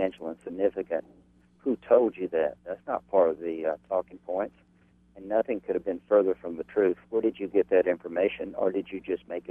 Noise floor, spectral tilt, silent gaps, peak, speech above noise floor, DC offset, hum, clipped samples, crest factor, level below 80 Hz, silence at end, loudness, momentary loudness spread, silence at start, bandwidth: -62 dBFS; -8.5 dB/octave; none; -8 dBFS; 34 dB; under 0.1%; none; under 0.1%; 20 dB; -64 dBFS; 0.1 s; -28 LUFS; 10 LU; 0 s; 3.7 kHz